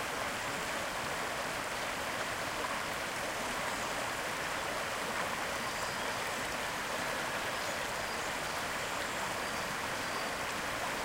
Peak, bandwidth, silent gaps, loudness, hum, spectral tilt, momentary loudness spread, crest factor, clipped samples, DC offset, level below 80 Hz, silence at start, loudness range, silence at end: -22 dBFS; 16 kHz; none; -35 LUFS; none; -2 dB/octave; 1 LU; 14 dB; under 0.1%; under 0.1%; -58 dBFS; 0 s; 0 LU; 0 s